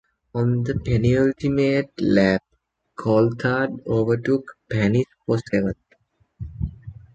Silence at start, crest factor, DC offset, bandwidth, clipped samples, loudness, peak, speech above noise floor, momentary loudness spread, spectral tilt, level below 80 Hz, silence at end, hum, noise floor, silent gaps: 0.35 s; 18 dB; under 0.1%; 8 kHz; under 0.1%; -22 LUFS; -4 dBFS; 42 dB; 13 LU; -8 dB/octave; -42 dBFS; 0.25 s; none; -62 dBFS; none